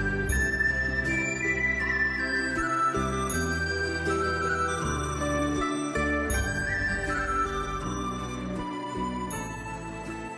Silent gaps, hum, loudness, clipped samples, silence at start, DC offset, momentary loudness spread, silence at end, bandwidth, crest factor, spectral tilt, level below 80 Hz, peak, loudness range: none; none; -28 LUFS; under 0.1%; 0 s; under 0.1%; 8 LU; 0 s; 11 kHz; 14 dB; -4.5 dB/octave; -38 dBFS; -14 dBFS; 4 LU